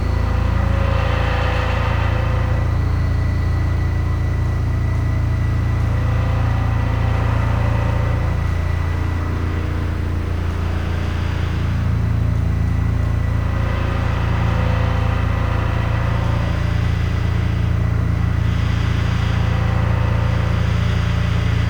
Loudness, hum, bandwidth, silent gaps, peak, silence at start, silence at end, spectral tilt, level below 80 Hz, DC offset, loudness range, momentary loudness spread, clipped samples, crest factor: -20 LUFS; none; 8.8 kHz; none; -8 dBFS; 0 s; 0 s; -7.5 dB/octave; -24 dBFS; under 0.1%; 2 LU; 3 LU; under 0.1%; 10 dB